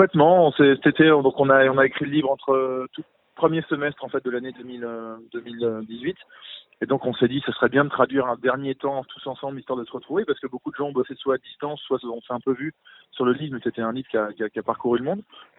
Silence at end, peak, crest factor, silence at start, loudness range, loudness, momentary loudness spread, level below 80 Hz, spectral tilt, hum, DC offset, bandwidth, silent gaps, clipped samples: 0.15 s; -2 dBFS; 22 dB; 0 s; 9 LU; -23 LUFS; 17 LU; -64 dBFS; -10.5 dB/octave; none; under 0.1%; 4.1 kHz; none; under 0.1%